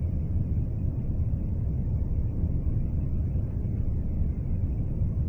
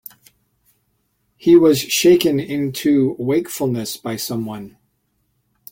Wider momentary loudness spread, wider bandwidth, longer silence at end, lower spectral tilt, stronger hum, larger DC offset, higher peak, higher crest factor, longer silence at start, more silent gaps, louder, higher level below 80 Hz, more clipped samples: second, 1 LU vs 13 LU; second, 2.7 kHz vs 17 kHz; second, 0 s vs 1 s; first, -12 dB/octave vs -5 dB/octave; neither; neither; second, -16 dBFS vs -2 dBFS; about the same, 12 dB vs 16 dB; second, 0 s vs 1.45 s; neither; second, -30 LUFS vs -17 LUFS; first, -30 dBFS vs -58 dBFS; neither